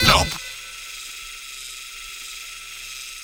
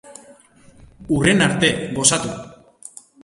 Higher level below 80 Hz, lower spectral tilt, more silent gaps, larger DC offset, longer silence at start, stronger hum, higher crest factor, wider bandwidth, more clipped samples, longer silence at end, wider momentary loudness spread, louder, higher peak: first, -38 dBFS vs -48 dBFS; about the same, -2.5 dB/octave vs -3.5 dB/octave; neither; neither; about the same, 0 s vs 0.05 s; neither; about the same, 26 dB vs 22 dB; first, over 20 kHz vs 11.5 kHz; neither; second, 0 s vs 0.7 s; second, 12 LU vs 24 LU; second, -27 LUFS vs -17 LUFS; about the same, 0 dBFS vs 0 dBFS